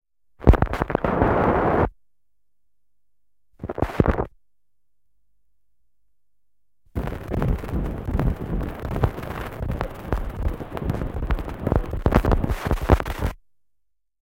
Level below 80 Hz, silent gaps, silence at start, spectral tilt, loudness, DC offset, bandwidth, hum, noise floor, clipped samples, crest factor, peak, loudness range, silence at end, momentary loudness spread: -28 dBFS; none; 0.4 s; -8 dB/octave; -24 LUFS; 0.1%; 17 kHz; none; -82 dBFS; under 0.1%; 24 dB; -2 dBFS; 7 LU; 0.9 s; 11 LU